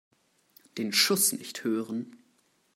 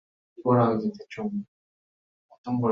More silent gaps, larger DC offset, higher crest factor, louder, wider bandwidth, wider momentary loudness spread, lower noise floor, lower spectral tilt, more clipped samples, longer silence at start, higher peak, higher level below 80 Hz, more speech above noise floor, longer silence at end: second, none vs 1.48-2.29 s, 2.38-2.44 s; neither; about the same, 22 dB vs 20 dB; about the same, -27 LUFS vs -27 LUFS; first, 16 kHz vs 6.8 kHz; about the same, 17 LU vs 17 LU; second, -69 dBFS vs under -90 dBFS; second, -2 dB/octave vs -10 dB/octave; neither; first, 0.75 s vs 0.4 s; about the same, -10 dBFS vs -8 dBFS; second, -82 dBFS vs -66 dBFS; second, 40 dB vs over 65 dB; first, 0.6 s vs 0 s